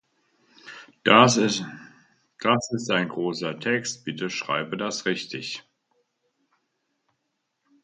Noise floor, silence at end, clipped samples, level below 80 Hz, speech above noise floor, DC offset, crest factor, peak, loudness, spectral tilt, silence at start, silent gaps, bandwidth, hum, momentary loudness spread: -78 dBFS; 2.25 s; under 0.1%; -68 dBFS; 54 dB; under 0.1%; 26 dB; 0 dBFS; -24 LUFS; -4 dB/octave; 0.65 s; none; 9.4 kHz; none; 19 LU